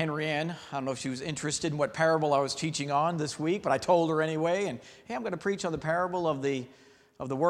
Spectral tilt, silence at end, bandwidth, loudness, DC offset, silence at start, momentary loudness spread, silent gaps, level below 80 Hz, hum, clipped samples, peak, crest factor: -5 dB/octave; 0 s; 12.5 kHz; -30 LUFS; under 0.1%; 0 s; 10 LU; none; -64 dBFS; none; under 0.1%; -12 dBFS; 18 dB